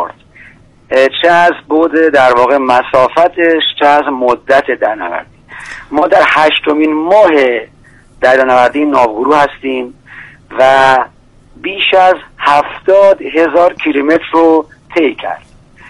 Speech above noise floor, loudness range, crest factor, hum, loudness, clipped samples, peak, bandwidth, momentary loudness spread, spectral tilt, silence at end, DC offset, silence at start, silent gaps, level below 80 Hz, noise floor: 32 dB; 2 LU; 10 dB; none; -9 LUFS; 0.4%; 0 dBFS; 11.5 kHz; 13 LU; -4.5 dB/octave; 0.5 s; under 0.1%; 0 s; none; -46 dBFS; -41 dBFS